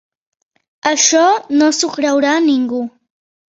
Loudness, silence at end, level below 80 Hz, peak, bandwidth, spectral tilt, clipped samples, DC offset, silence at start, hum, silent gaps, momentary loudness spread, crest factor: -14 LUFS; 0.65 s; -64 dBFS; 0 dBFS; 8 kHz; -1 dB/octave; under 0.1%; under 0.1%; 0.85 s; none; none; 10 LU; 16 dB